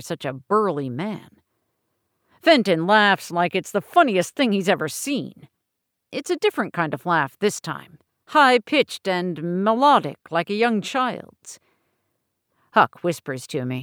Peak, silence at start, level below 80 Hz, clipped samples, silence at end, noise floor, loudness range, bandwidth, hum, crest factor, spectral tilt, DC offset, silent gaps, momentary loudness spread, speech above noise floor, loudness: -4 dBFS; 0 s; -72 dBFS; under 0.1%; 0 s; -79 dBFS; 5 LU; over 20 kHz; none; 18 dB; -4.5 dB/octave; under 0.1%; none; 14 LU; 58 dB; -21 LUFS